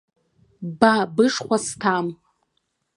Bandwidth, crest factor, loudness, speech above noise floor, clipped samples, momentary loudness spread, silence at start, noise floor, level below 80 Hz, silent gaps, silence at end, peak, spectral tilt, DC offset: 11.5 kHz; 22 dB; -21 LUFS; 53 dB; under 0.1%; 15 LU; 0.6 s; -73 dBFS; -64 dBFS; none; 0.8 s; 0 dBFS; -4.5 dB/octave; under 0.1%